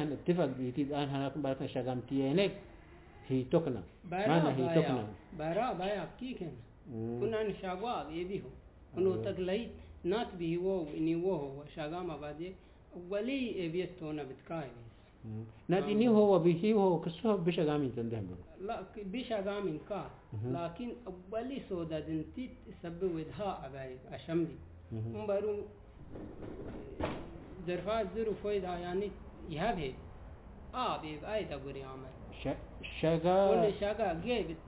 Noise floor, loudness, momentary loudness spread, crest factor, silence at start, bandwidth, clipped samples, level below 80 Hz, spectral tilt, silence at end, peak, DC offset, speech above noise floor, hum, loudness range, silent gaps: -55 dBFS; -35 LUFS; 17 LU; 20 dB; 0 s; 4 kHz; under 0.1%; -56 dBFS; -6 dB/octave; 0 s; -16 dBFS; under 0.1%; 20 dB; none; 9 LU; none